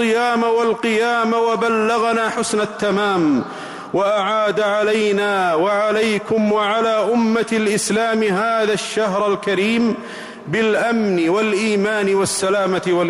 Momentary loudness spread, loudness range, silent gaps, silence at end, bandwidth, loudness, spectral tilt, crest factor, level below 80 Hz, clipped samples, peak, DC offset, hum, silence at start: 3 LU; 1 LU; none; 0 s; 15.5 kHz; -17 LUFS; -4.5 dB/octave; 8 dB; -58 dBFS; under 0.1%; -8 dBFS; under 0.1%; none; 0 s